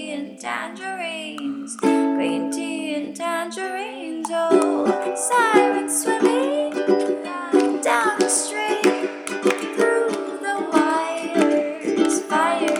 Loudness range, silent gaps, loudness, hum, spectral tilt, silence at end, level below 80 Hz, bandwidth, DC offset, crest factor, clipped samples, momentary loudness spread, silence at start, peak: 5 LU; none; -21 LUFS; none; -3 dB/octave; 0 s; -76 dBFS; 16.5 kHz; under 0.1%; 20 dB; under 0.1%; 10 LU; 0 s; -2 dBFS